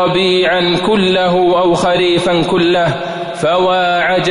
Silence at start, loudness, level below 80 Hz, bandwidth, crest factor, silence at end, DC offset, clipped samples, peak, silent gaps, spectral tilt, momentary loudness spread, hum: 0 s; -12 LUFS; -44 dBFS; 11 kHz; 8 dB; 0 s; under 0.1%; under 0.1%; -4 dBFS; none; -5.5 dB/octave; 4 LU; none